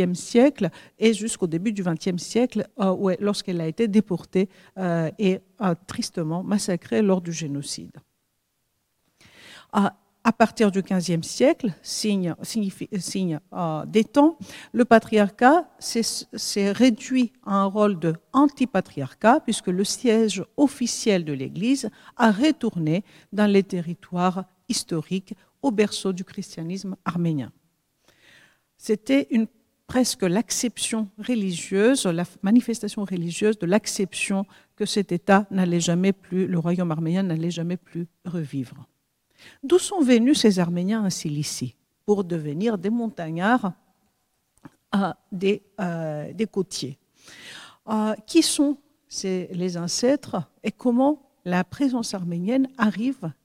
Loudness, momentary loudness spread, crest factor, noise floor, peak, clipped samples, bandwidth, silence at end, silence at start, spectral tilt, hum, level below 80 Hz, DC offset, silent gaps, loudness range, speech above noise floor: -23 LUFS; 11 LU; 22 dB; -73 dBFS; 0 dBFS; under 0.1%; 16 kHz; 0.1 s; 0 s; -5 dB/octave; none; -64 dBFS; under 0.1%; none; 6 LU; 50 dB